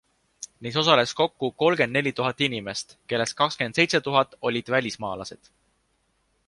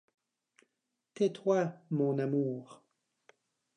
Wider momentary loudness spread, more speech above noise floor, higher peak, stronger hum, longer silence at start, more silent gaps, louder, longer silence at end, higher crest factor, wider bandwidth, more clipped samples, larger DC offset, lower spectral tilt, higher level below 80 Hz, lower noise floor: first, 14 LU vs 5 LU; second, 45 dB vs 53 dB; first, -2 dBFS vs -16 dBFS; neither; second, 0.4 s vs 1.2 s; neither; first, -24 LUFS vs -33 LUFS; about the same, 1.1 s vs 1 s; first, 24 dB vs 18 dB; first, 11.5 kHz vs 10 kHz; neither; neither; second, -4 dB/octave vs -7.5 dB/octave; first, -62 dBFS vs under -90 dBFS; second, -70 dBFS vs -85 dBFS